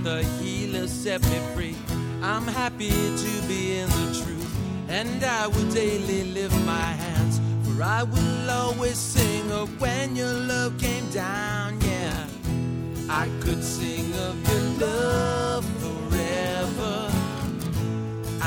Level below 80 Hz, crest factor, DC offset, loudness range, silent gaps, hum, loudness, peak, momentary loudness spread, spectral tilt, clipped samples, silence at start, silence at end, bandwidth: -38 dBFS; 20 dB; under 0.1%; 2 LU; none; none; -26 LUFS; -6 dBFS; 6 LU; -5 dB/octave; under 0.1%; 0 s; 0 s; over 20 kHz